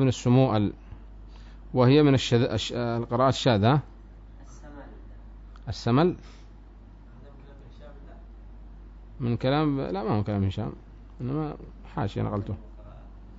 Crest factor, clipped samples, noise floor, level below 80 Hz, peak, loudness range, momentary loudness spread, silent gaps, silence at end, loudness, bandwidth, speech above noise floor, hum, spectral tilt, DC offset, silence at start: 18 dB; under 0.1%; -47 dBFS; -46 dBFS; -8 dBFS; 8 LU; 26 LU; none; 0 s; -25 LUFS; 7.8 kHz; 23 dB; none; -7 dB/octave; under 0.1%; 0 s